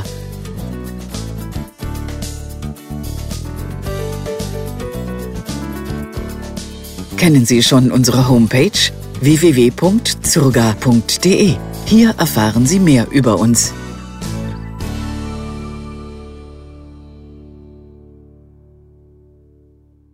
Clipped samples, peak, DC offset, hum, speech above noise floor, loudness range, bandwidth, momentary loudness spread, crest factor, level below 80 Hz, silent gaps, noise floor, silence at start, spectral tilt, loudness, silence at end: under 0.1%; 0 dBFS; under 0.1%; none; 38 dB; 15 LU; 16 kHz; 18 LU; 16 dB; -32 dBFS; none; -50 dBFS; 0 s; -5 dB/octave; -14 LUFS; 2.35 s